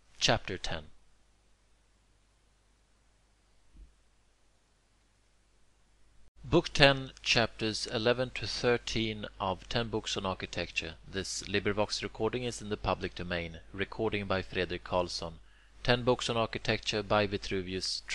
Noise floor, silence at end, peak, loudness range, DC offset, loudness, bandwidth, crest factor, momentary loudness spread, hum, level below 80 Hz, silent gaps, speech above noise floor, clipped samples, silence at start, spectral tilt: -69 dBFS; 0 s; -4 dBFS; 6 LU; under 0.1%; -32 LUFS; 12 kHz; 30 dB; 9 LU; none; -50 dBFS; 6.28-6.35 s; 37 dB; under 0.1%; 0.2 s; -4 dB/octave